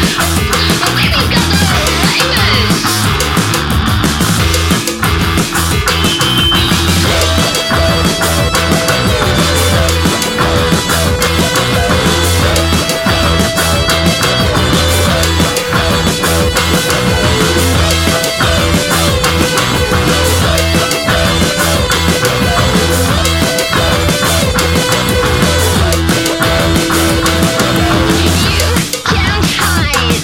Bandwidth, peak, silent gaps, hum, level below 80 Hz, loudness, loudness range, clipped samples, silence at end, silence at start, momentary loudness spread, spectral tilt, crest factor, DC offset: 17 kHz; 0 dBFS; none; none; -22 dBFS; -10 LUFS; 1 LU; under 0.1%; 0 s; 0 s; 2 LU; -4 dB/octave; 10 dB; under 0.1%